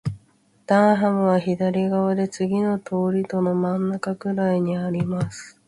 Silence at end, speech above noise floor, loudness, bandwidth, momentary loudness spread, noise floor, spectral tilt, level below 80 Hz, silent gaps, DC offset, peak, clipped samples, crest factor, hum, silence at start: 0.2 s; 38 dB; -22 LUFS; 11.5 kHz; 8 LU; -60 dBFS; -7.5 dB/octave; -58 dBFS; none; under 0.1%; -6 dBFS; under 0.1%; 16 dB; none; 0.05 s